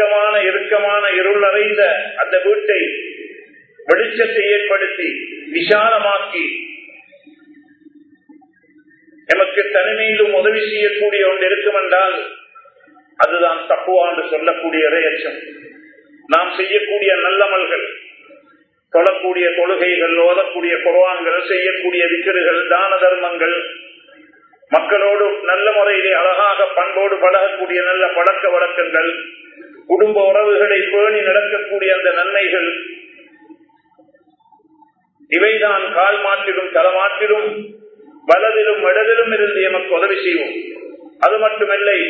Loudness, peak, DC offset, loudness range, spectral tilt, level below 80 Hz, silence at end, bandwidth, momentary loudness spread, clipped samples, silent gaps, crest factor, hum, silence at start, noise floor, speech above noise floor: -14 LUFS; 0 dBFS; under 0.1%; 5 LU; -4.5 dB/octave; -78 dBFS; 0 s; 6 kHz; 9 LU; under 0.1%; none; 16 dB; none; 0 s; -53 dBFS; 39 dB